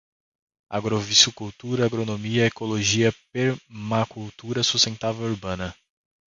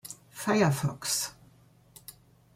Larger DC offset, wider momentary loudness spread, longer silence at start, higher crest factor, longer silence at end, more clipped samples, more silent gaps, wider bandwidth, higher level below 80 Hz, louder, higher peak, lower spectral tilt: neither; second, 14 LU vs 23 LU; first, 0.7 s vs 0.05 s; about the same, 22 dB vs 20 dB; about the same, 0.55 s vs 0.45 s; neither; neither; second, 10 kHz vs 16.5 kHz; first, -52 dBFS vs -66 dBFS; first, -23 LUFS vs -29 LUFS; first, -2 dBFS vs -12 dBFS; about the same, -3.5 dB/octave vs -4.5 dB/octave